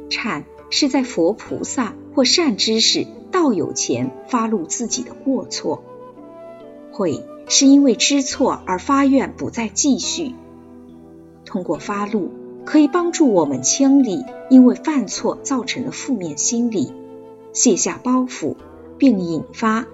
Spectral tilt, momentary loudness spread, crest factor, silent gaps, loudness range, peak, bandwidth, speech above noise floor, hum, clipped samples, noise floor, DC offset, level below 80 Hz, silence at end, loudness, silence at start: -3 dB/octave; 13 LU; 18 dB; none; 6 LU; -2 dBFS; 8 kHz; 24 dB; none; under 0.1%; -42 dBFS; under 0.1%; -58 dBFS; 0 s; -18 LUFS; 0 s